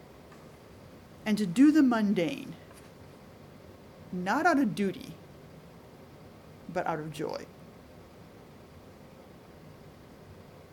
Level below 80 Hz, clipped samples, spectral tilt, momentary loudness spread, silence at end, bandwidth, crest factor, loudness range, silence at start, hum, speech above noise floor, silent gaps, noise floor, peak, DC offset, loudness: -64 dBFS; under 0.1%; -6 dB/octave; 27 LU; 0.1 s; 18.5 kHz; 20 dB; 14 LU; 0.3 s; none; 24 dB; none; -51 dBFS; -12 dBFS; under 0.1%; -28 LUFS